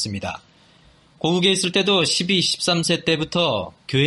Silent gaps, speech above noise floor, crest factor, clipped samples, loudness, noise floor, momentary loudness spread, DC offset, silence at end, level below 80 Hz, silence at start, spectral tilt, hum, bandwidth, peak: none; 33 dB; 16 dB; under 0.1%; -19 LUFS; -53 dBFS; 10 LU; under 0.1%; 0 s; -56 dBFS; 0 s; -3.5 dB/octave; none; 11.5 kHz; -4 dBFS